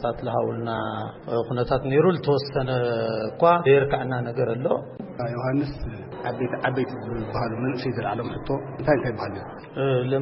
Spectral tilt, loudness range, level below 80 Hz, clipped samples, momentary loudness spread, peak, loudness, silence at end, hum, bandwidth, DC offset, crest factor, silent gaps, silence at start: -11.5 dB/octave; 6 LU; -46 dBFS; under 0.1%; 12 LU; -6 dBFS; -25 LUFS; 0 s; none; 5.8 kHz; under 0.1%; 18 dB; none; 0 s